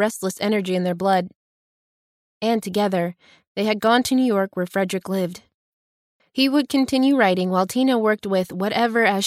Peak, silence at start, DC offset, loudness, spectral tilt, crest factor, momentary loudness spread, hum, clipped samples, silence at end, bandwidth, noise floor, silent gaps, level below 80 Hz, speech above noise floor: -4 dBFS; 0 s; under 0.1%; -21 LUFS; -5 dB/octave; 16 dB; 8 LU; none; under 0.1%; 0 s; 15.5 kHz; under -90 dBFS; 1.36-2.41 s, 3.47-3.55 s, 5.54-6.20 s; -64 dBFS; over 70 dB